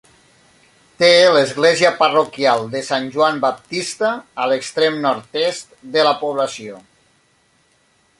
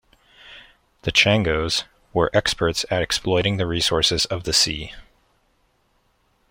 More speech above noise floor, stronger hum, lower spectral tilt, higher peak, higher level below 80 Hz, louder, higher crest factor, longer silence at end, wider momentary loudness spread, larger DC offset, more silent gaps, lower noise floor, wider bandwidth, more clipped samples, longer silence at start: about the same, 42 dB vs 44 dB; neither; about the same, -3 dB/octave vs -3.5 dB/octave; about the same, -2 dBFS vs -2 dBFS; second, -64 dBFS vs -42 dBFS; first, -16 LUFS vs -20 LUFS; about the same, 18 dB vs 22 dB; about the same, 1.4 s vs 1.5 s; first, 10 LU vs 7 LU; neither; neither; second, -59 dBFS vs -65 dBFS; second, 11.5 kHz vs 16.5 kHz; neither; first, 1 s vs 0.45 s